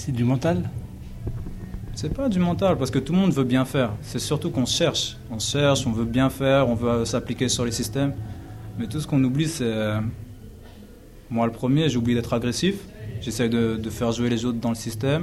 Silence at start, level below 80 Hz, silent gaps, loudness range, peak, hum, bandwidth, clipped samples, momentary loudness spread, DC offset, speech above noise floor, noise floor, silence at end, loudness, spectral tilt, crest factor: 0 s; -42 dBFS; none; 3 LU; -6 dBFS; none; 15.5 kHz; under 0.1%; 14 LU; under 0.1%; 22 dB; -44 dBFS; 0 s; -24 LUFS; -5.5 dB/octave; 16 dB